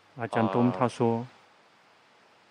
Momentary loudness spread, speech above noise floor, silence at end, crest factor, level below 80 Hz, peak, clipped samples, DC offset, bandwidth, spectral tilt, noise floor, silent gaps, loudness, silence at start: 8 LU; 34 dB; 1.25 s; 20 dB; -74 dBFS; -10 dBFS; under 0.1%; under 0.1%; 10 kHz; -7.5 dB/octave; -60 dBFS; none; -27 LUFS; 0.15 s